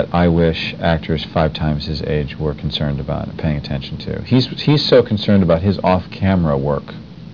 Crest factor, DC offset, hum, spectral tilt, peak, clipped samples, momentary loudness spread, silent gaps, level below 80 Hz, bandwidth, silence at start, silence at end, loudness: 16 dB; 0.4%; none; -8 dB/octave; 0 dBFS; under 0.1%; 10 LU; none; -34 dBFS; 5.4 kHz; 0 s; 0 s; -17 LUFS